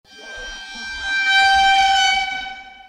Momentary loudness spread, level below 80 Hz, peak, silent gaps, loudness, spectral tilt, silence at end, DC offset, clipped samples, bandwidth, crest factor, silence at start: 19 LU; -46 dBFS; -4 dBFS; none; -15 LUFS; 1 dB/octave; 0.15 s; under 0.1%; under 0.1%; 13.5 kHz; 14 dB; 0.15 s